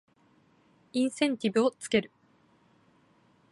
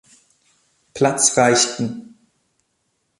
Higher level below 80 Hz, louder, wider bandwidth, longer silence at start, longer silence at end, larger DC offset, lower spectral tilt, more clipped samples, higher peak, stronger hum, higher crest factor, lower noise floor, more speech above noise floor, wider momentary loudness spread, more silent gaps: second, -70 dBFS vs -62 dBFS; second, -29 LUFS vs -17 LUFS; about the same, 11.5 kHz vs 11.5 kHz; about the same, 0.95 s vs 0.95 s; first, 1.45 s vs 1.2 s; neither; first, -4.5 dB/octave vs -2.5 dB/octave; neither; second, -12 dBFS vs -2 dBFS; neither; about the same, 20 dB vs 20 dB; second, -65 dBFS vs -70 dBFS; second, 37 dB vs 53 dB; second, 7 LU vs 19 LU; neither